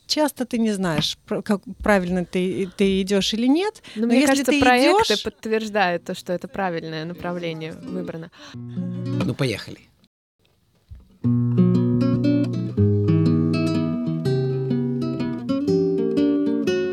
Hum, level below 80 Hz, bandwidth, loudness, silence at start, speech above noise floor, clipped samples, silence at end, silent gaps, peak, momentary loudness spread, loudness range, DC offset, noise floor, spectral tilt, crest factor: none; -50 dBFS; 15.5 kHz; -22 LUFS; 0.1 s; 40 dB; under 0.1%; 0 s; 10.07-10.39 s; -2 dBFS; 12 LU; 10 LU; under 0.1%; -62 dBFS; -6 dB/octave; 18 dB